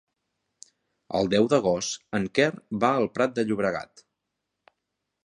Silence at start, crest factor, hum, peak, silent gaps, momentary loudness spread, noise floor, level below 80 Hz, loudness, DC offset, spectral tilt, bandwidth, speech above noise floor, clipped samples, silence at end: 1.1 s; 22 dB; none; -6 dBFS; none; 8 LU; -82 dBFS; -62 dBFS; -25 LUFS; under 0.1%; -5 dB/octave; 11.5 kHz; 58 dB; under 0.1%; 1.4 s